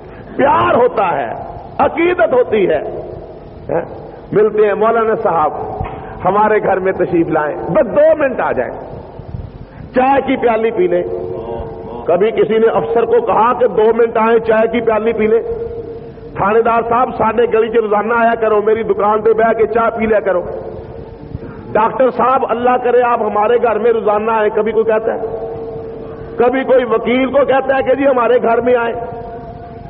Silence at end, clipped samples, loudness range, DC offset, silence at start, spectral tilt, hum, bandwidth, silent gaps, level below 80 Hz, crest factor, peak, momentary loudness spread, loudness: 0 s; under 0.1%; 3 LU; under 0.1%; 0 s; -5 dB/octave; none; 4.3 kHz; none; -40 dBFS; 12 dB; -2 dBFS; 16 LU; -13 LUFS